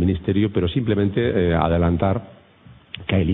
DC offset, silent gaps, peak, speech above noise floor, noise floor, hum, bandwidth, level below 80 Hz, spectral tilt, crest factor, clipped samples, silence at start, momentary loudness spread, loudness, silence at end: under 0.1%; none; -4 dBFS; 29 dB; -48 dBFS; none; 4 kHz; -36 dBFS; -12 dB/octave; 18 dB; under 0.1%; 0 s; 7 LU; -20 LUFS; 0 s